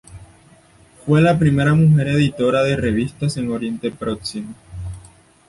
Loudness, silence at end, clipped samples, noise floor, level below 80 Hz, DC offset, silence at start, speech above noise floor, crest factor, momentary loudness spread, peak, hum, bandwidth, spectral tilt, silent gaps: -18 LUFS; 0.5 s; under 0.1%; -50 dBFS; -42 dBFS; under 0.1%; 0.1 s; 33 dB; 16 dB; 18 LU; -2 dBFS; none; 11.5 kHz; -7 dB/octave; none